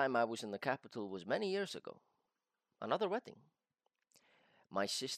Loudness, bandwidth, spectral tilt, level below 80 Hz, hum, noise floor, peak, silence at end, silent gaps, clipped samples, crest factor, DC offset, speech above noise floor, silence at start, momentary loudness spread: -40 LUFS; 15 kHz; -3.5 dB/octave; under -90 dBFS; none; -89 dBFS; -20 dBFS; 0 s; none; under 0.1%; 22 dB; under 0.1%; 49 dB; 0 s; 12 LU